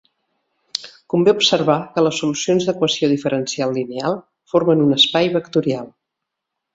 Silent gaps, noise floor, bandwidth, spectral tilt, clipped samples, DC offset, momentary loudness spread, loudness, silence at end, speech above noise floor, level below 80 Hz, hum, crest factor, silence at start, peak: none; -80 dBFS; 8 kHz; -4.5 dB/octave; under 0.1%; under 0.1%; 12 LU; -18 LUFS; 0.85 s; 63 dB; -62 dBFS; none; 18 dB; 0.75 s; 0 dBFS